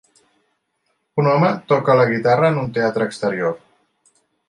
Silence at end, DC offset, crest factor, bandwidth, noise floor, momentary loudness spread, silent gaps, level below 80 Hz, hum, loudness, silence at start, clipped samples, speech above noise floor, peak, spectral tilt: 0.9 s; under 0.1%; 16 dB; 11 kHz; -70 dBFS; 8 LU; none; -60 dBFS; none; -18 LUFS; 1.15 s; under 0.1%; 53 dB; -2 dBFS; -7.5 dB/octave